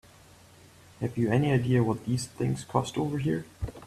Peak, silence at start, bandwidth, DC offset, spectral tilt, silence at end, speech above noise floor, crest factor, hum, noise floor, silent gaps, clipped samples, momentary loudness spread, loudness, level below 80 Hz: -10 dBFS; 1 s; 13.5 kHz; under 0.1%; -7 dB/octave; 0 s; 27 dB; 20 dB; none; -54 dBFS; none; under 0.1%; 9 LU; -28 LUFS; -52 dBFS